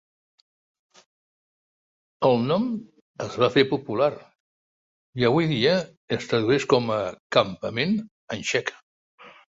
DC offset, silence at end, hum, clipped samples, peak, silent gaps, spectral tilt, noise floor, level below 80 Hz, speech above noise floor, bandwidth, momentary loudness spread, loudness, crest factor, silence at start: under 0.1%; 0.25 s; none; under 0.1%; -2 dBFS; 3.01-3.14 s, 4.35-5.13 s, 5.97-6.08 s, 7.20-7.30 s, 8.11-8.28 s, 8.83-9.18 s; -5.5 dB/octave; under -90 dBFS; -62 dBFS; over 67 dB; 8 kHz; 13 LU; -24 LUFS; 22 dB; 2.2 s